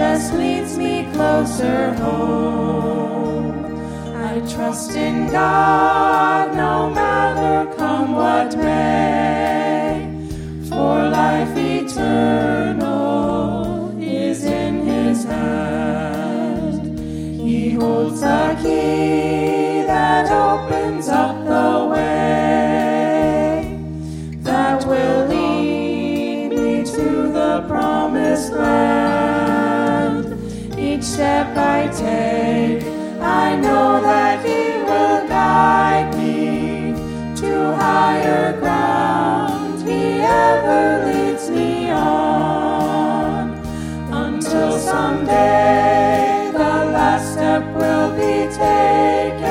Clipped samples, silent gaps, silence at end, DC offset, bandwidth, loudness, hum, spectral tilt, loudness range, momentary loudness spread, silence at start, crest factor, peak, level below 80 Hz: under 0.1%; none; 0 s; under 0.1%; 16 kHz; -17 LUFS; none; -6 dB/octave; 4 LU; 9 LU; 0 s; 16 dB; -2 dBFS; -40 dBFS